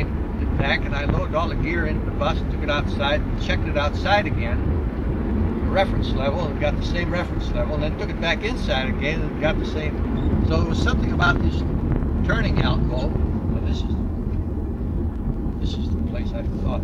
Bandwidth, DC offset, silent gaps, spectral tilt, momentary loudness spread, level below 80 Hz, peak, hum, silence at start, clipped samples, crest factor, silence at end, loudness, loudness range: 7.4 kHz; under 0.1%; none; -7 dB/octave; 6 LU; -26 dBFS; -2 dBFS; none; 0 s; under 0.1%; 20 dB; 0 s; -23 LUFS; 3 LU